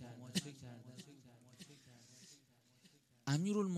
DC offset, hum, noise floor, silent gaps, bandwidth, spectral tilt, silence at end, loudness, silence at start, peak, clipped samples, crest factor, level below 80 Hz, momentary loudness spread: under 0.1%; none; -71 dBFS; none; 13.5 kHz; -5.5 dB/octave; 0 s; -42 LUFS; 0 s; -24 dBFS; under 0.1%; 20 dB; -82 dBFS; 24 LU